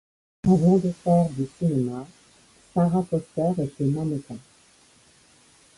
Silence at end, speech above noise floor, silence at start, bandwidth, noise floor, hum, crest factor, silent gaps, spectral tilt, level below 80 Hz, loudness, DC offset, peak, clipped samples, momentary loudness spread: 1.4 s; 34 dB; 0.45 s; 11.5 kHz; -57 dBFS; none; 18 dB; none; -9.5 dB/octave; -54 dBFS; -24 LUFS; under 0.1%; -8 dBFS; under 0.1%; 14 LU